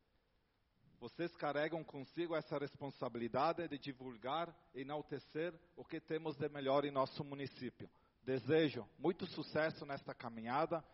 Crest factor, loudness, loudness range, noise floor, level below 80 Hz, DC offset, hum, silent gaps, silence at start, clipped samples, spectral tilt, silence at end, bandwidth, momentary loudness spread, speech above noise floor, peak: 20 dB; -42 LUFS; 4 LU; -79 dBFS; -78 dBFS; under 0.1%; none; none; 1 s; under 0.1%; -4.5 dB/octave; 0.1 s; 5.8 kHz; 14 LU; 38 dB; -22 dBFS